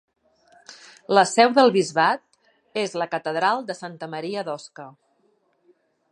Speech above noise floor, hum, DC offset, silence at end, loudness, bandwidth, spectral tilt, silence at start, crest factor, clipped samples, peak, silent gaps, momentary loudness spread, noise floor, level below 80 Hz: 44 dB; none; under 0.1%; 1.2 s; -22 LUFS; 11.5 kHz; -4 dB/octave; 0.7 s; 22 dB; under 0.1%; -2 dBFS; none; 19 LU; -66 dBFS; -80 dBFS